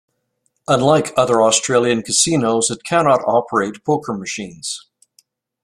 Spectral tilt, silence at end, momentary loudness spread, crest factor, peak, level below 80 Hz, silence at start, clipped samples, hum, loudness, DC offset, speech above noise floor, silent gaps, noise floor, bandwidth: -3.5 dB/octave; 0.85 s; 12 LU; 18 dB; 0 dBFS; -56 dBFS; 0.7 s; under 0.1%; none; -16 LUFS; under 0.1%; 52 dB; none; -69 dBFS; 15.5 kHz